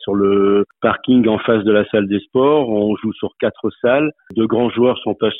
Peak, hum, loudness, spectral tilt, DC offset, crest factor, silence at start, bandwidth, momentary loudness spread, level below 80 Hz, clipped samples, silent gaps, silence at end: -2 dBFS; none; -16 LUFS; -10.5 dB/octave; under 0.1%; 14 dB; 0 s; 4 kHz; 7 LU; -54 dBFS; under 0.1%; none; 0 s